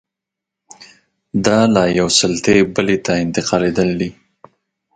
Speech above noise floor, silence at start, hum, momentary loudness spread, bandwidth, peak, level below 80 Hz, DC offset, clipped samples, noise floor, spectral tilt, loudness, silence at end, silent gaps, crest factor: 68 dB; 0.8 s; none; 6 LU; 9.4 kHz; 0 dBFS; -46 dBFS; under 0.1%; under 0.1%; -83 dBFS; -4.5 dB/octave; -15 LUFS; 0.85 s; none; 18 dB